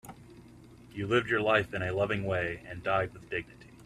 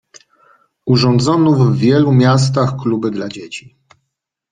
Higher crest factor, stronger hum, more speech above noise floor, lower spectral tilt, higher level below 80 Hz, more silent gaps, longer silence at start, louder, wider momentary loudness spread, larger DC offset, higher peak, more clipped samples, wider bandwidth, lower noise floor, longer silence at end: first, 20 dB vs 14 dB; neither; second, 22 dB vs 62 dB; about the same, -6.5 dB/octave vs -7 dB/octave; second, -58 dBFS vs -50 dBFS; neither; second, 0.05 s vs 0.85 s; second, -31 LUFS vs -13 LUFS; second, 13 LU vs 16 LU; neither; second, -12 dBFS vs 0 dBFS; neither; first, 13 kHz vs 9.6 kHz; second, -53 dBFS vs -75 dBFS; second, 0 s vs 0.95 s